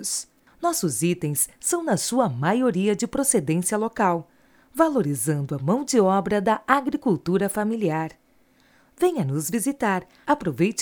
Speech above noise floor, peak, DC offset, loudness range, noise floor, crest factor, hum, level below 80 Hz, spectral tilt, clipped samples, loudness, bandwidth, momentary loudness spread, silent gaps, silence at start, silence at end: 37 dB; -2 dBFS; under 0.1%; 3 LU; -60 dBFS; 22 dB; none; -58 dBFS; -5 dB/octave; under 0.1%; -23 LUFS; over 20 kHz; 5 LU; none; 0 s; 0 s